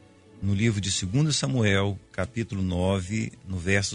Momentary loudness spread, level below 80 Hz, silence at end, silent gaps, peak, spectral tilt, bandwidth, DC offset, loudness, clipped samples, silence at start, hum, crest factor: 9 LU; -50 dBFS; 0 s; none; -10 dBFS; -5 dB/octave; 10.5 kHz; under 0.1%; -26 LUFS; under 0.1%; 0.35 s; none; 16 dB